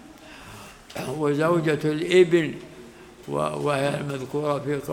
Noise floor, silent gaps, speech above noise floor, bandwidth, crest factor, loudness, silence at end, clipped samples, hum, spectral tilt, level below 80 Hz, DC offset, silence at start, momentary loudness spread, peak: -45 dBFS; none; 22 dB; 16.5 kHz; 18 dB; -24 LUFS; 0 s; under 0.1%; none; -6 dB/octave; -58 dBFS; under 0.1%; 0.05 s; 24 LU; -6 dBFS